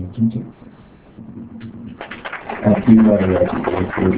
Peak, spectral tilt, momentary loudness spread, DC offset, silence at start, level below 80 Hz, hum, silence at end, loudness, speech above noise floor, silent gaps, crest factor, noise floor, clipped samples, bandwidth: 0 dBFS; -12 dB/octave; 24 LU; under 0.1%; 0 s; -40 dBFS; none; 0 s; -15 LUFS; 29 dB; none; 18 dB; -44 dBFS; under 0.1%; 4 kHz